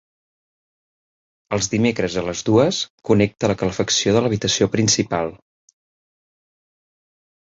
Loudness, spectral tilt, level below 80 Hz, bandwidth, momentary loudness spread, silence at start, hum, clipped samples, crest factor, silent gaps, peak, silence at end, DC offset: -19 LUFS; -4 dB/octave; -48 dBFS; 8 kHz; 7 LU; 1.5 s; none; under 0.1%; 20 dB; 2.90-2.98 s; -2 dBFS; 2.15 s; under 0.1%